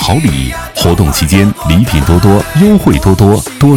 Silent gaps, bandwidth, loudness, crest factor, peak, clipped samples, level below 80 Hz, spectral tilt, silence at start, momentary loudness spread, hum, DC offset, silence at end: none; over 20 kHz; -9 LUFS; 8 dB; 0 dBFS; 1%; -20 dBFS; -6 dB/octave; 0 s; 5 LU; none; under 0.1%; 0 s